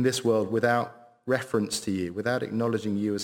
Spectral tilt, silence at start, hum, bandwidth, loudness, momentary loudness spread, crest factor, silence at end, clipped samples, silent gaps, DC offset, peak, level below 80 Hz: -5 dB/octave; 0 s; none; 17 kHz; -27 LUFS; 5 LU; 18 dB; 0 s; under 0.1%; none; under 0.1%; -10 dBFS; -66 dBFS